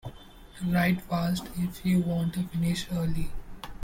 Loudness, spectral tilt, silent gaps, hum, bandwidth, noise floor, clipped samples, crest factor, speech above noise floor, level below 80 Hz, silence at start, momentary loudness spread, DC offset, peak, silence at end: -29 LUFS; -6.5 dB/octave; none; none; 16.5 kHz; -48 dBFS; under 0.1%; 14 dB; 21 dB; -44 dBFS; 0.05 s; 14 LU; under 0.1%; -14 dBFS; 0 s